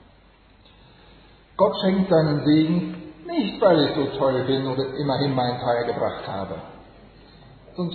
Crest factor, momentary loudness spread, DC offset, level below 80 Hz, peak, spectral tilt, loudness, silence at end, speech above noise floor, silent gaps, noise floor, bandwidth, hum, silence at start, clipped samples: 18 dB; 15 LU; under 0.1%; -54 dBFS; -6 dBFS; -10 dB/octave; -22 LUFS; 0 s; 32 dB; none; -53 dBFS; 4.6 kHz; none; 1.6 s; under 0.1%